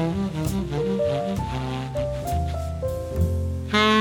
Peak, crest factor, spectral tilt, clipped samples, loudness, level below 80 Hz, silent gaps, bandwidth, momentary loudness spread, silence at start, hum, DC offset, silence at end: -4 dBFS; 20 dB; -6 dB/octave; under 0.1%; -25 LUFS; -34 dBFS; none; 19 kHz; 5 LU; 0 s; none; under 0.1%; 0 s